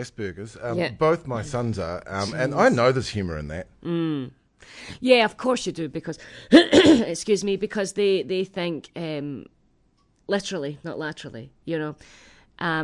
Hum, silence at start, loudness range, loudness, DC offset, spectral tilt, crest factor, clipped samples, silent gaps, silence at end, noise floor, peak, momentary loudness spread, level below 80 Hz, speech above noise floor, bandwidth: none; 0 s; 12 LU; -23 LUFS; under 0.1%; -5 dB/octave; 22 dB; under 0.1%; none; 0 s; -64 dBFS; -2 dBFS; 17 LU; -54 dBFS; 40 dB; 11 kHz